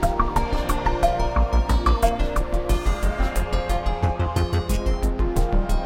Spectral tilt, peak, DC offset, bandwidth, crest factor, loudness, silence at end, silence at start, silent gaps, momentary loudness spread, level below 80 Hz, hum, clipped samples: -6 dB/octave; -4 dBFS; under 0.1%; 16.5 kHz; 16 dB; -23 LUFS; 0 s; 0 s; none; 4 LU; -22 dBFS; none; under 0.1%